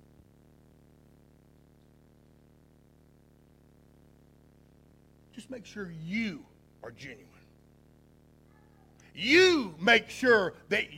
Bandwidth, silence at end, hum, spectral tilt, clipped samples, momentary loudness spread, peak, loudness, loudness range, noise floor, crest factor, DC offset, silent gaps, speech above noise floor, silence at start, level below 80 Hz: 15.5 kHz; 0 s; none; -4 dB/octave; under 0.1%; 27 LU; -8 dBFS; -26 LUFS; 20 LU; -61 dBFS; 26 dB; under 0.1%; none; 33 dB; 5.35 s; -64 dBFS